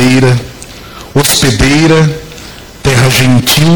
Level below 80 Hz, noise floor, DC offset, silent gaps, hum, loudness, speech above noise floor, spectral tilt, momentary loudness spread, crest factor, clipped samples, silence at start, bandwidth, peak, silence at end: -26 dBFS; -29 dBFS; under 0.1%; none; none; -8 LUFS; 22 dB; -4.5 dB/octave; 21 LU; 8 dB; under 0.1%; 0 s; over 20 kHz; 0 dBFS; 0 s